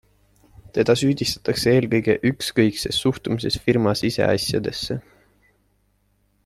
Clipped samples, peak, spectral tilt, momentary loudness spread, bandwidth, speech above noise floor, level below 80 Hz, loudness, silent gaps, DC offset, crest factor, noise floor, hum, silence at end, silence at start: under 0.1%; -4 dBFS; -5 dB/octave; 7 LU; 14.5 kHz; 44 dB; -50 dBFS; -21 LUFS; none; under 0.1%; 18 dB; -65 dBFS; 50 Hz at -50 dBFS; 1.45 s; 0.75 s